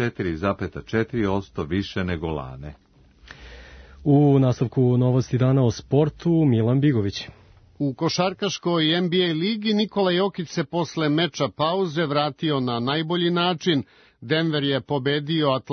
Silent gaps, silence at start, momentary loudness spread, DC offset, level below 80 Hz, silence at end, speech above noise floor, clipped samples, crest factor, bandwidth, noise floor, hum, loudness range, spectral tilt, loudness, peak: none; 0 s; 9 LU; under 0.1%; -52 dBFS; 0 s; 27 dB; under 0.1%; 16 dB; 6.6 kHz; -48 dBFS; none; 6 LU; -6.5 dB/octave; -22 LUFS; -6 dBFS